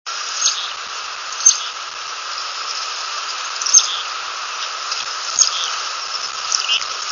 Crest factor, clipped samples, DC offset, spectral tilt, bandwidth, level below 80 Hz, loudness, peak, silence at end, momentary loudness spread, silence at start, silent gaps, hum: 22 dB; under 0.1%; under 0.1%; 4.5 dB/octave; 11 kHz; -70 dBFS; -18 LUFS; 0 dBFS; 0 s; 13 LU; 0.05 s; none; none